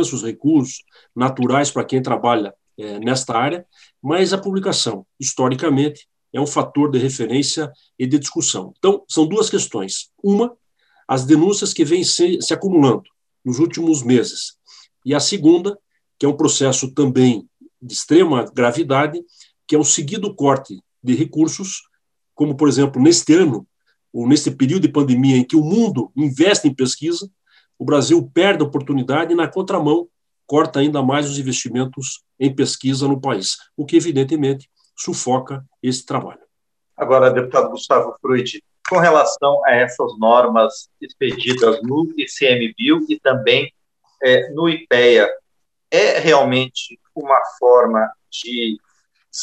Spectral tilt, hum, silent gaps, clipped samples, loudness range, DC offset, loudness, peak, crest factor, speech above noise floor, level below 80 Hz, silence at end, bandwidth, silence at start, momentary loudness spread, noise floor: -4.5 dB/octave; none; none; under 0.1%; 4 LU; under 0.1%; -17 LUFS; 0 dBFS; 16 dB; 60 dB; -66 dBFS; 0 s; 11 kHz; 0 s; 13 LU; -76 dBFS